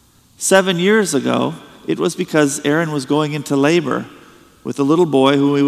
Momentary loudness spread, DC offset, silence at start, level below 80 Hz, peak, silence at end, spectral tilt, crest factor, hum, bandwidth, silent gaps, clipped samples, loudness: 11 LU; under 0.1%; 0.4 s; -62 dBFS; 0 dBFS; 0 s; -4.5 dB/octave; 16 dB; none; 15 kHz; none; under 0.1%; -16 LUFS